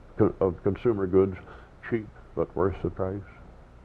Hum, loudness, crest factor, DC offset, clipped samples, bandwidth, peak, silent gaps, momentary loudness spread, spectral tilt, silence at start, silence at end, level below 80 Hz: none; -28 LUFS; 20 dB; under 0.1%; under 0.1%; 4.4 kHz; -8 dBFS; none; 18 LU; -10.5 dB/octave; 0 s; 0.3 s; -48 dBFS